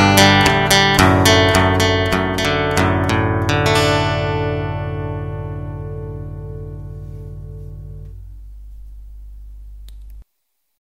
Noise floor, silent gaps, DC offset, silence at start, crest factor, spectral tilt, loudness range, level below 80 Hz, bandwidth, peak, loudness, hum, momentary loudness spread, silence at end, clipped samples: -73 dBFS; none; under 0.1%; 0 s; 18 dB; -4.5 dB/octave; 22 LU; -34 dBFS; 16 kHz; 0 dBFS; -15 LUFS; 50 Hz at -35 dBFS; 22 LU; 0.75 s; under 0.1%